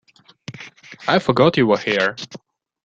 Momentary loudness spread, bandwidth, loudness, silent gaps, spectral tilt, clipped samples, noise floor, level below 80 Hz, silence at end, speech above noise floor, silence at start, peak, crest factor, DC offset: 23 LU; 8 kHz; -18 LUFS; none; -6 dB/octave; under 0.1%; -40 dBFS; -58 dBFS; 0.45 s; 23 dB; 0.5 s; -2 dBFS; 18 dB; under 0.1%